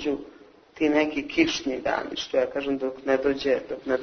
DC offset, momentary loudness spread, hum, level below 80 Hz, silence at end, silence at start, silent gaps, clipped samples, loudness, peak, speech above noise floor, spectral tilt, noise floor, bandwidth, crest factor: under 0.1%; 6 LU; none; -56 dBFS; 0 s; 0 s; none; under 0.1%; -26 LUFS; -6 dBFS; 25 dB; -4 dB/octave; -50 dBFS; 6.6 kHz; 20 dB